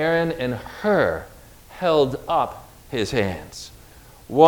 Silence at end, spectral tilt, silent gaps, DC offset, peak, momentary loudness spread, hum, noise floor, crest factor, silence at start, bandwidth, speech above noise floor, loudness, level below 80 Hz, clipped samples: 0 s; -5.5 dB/octave; none; under 0.1%; 0 dBFS; 19 LU; none; -46 dBFS; 22 dB; 0 s; over 20 kHz; 24 dB; -23 LUFS; -48 dBFS; under 0.1%